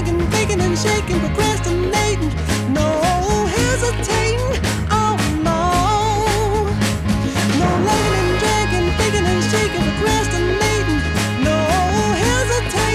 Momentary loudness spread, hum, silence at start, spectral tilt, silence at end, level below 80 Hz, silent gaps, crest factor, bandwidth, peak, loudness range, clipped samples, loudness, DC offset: 3 LU; none; 0 s; -4.5 dB/octave; 0 s; -26 dBFS; none; 14 dB; 15 kHz; -4 dBFS; 1 LU; under 0.1%; -17 LUFS; under 0.1%